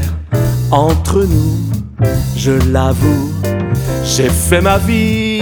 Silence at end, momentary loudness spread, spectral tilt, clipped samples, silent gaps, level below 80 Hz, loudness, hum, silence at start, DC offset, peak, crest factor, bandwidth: 0 s; 5 LU; -5.5 dB/octave; under 0.1%; none; -24 dBFS; -13 LUFS; none; 0 s; under 0.1%; 0 dBFS; 12 dB; over 20 kHz